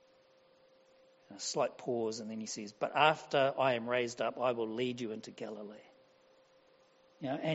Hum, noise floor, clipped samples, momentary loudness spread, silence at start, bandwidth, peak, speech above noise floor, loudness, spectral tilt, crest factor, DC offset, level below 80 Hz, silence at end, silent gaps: none; -66 dBFS; under 0.1%; 16 LU; 1.3 s; 8 kHz; -12 dBFS; 32 dB; -35 LUFS; -3 dB/octave; 24 dB; under 0.1%; -82 dBFS; 0 s; none